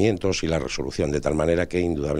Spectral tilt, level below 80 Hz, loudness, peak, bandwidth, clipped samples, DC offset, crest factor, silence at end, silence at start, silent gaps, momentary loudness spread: -5.5 dB/octave; -40 dBFS; -24 LUFS; -6 dBFS; 12 kHz; under 0.1%; under 0.1%; 16 dB; 0 s; 0 s; none; 4 LU